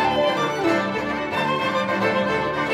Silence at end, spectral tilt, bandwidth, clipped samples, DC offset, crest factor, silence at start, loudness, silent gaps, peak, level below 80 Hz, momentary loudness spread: 0 s; -5 dB/octave; 16 kHz; under 0.1%; under 0.1%; 14 dB; 0 s; -22 LUFS; none; -8 dBFS; -52 dBFS; 3 LU